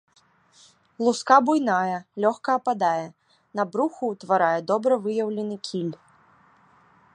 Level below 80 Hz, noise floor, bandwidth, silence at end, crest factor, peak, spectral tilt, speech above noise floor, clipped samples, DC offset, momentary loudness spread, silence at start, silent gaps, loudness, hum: -76 dBFS; -58 dBFS; 11 kHz; 1.2 s; 24 dB; -2 dBFS; -5.5 dB/octave; 35 dB; under 0.1%; under 0.1%; 12 LU; 1 s; none; -24 LUFS; none